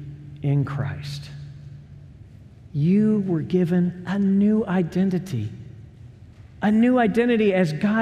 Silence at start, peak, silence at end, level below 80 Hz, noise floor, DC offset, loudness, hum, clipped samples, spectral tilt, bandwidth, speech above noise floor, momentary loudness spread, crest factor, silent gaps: 0 s; -8 dBFS; 0 s; -54 dBFS; -45 dBFS; under 0.1%; -22 LUFS; none; under 0.1%; -8.5 dB/octave; 9.8 kHz; 25 dB; 20 LU; 14 dB; none